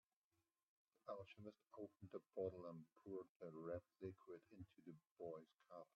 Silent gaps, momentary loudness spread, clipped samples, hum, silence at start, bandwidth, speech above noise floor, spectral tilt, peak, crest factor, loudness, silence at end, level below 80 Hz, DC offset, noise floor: 3.29-3.40 s, 5.12-5.16 s; 12 LU; under 0.1%; none; 1.05 s; 6.2 kHz; over 34 dB; -7.5 dB/octave; -36 dBFS; 20 dB; -57 LUFS; 0.1 s; -88 dBFS; under 0.1%; under -90 dBFS